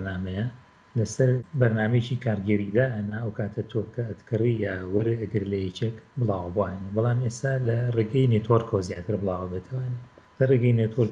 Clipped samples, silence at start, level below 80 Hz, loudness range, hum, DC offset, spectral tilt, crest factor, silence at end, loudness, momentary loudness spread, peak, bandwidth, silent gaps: under 0.1%; 0 s; -58 dBFS; 3 LU; none; under 0.1%; -7.5 dB/octave; 18 dB; 0 s; -26 LUFS; 9 LU; -6 dBFS; 9.6 kHz; none